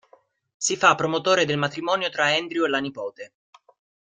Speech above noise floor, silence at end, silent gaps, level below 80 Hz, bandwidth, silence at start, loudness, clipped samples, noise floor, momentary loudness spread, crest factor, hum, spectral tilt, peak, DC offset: 36 dB; 0.85 s; none; -66 dBFS; 9.6 kHz; 0.6 s; -22 LUFS; under 0.1%; -59 dBFS; 16 LU; 22 dB; none; -3 dB/octave; -2 dBFS; under 0.1%